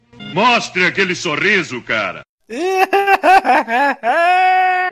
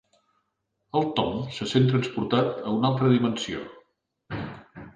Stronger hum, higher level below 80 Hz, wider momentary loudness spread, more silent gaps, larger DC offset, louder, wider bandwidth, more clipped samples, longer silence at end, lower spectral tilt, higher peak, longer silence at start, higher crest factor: neither; about the same, -56 dBFS vs -56 dBFS; second, 10 LU vs 15 LU; first, 2.29-2.38 s vs none; neither; first, -14 LUFS vs -25 LUFS; first, 14 kHz vs 9.4 kHz; neither; about the same, 0 s vs 0.05 s; second, -3.5 dB/octave vs -6.5 dB/octave; first, 0 dBFS vs -8 dBFS; second, 0.2 s vs 0.95 s; about the same, 14 dB vs 18 dB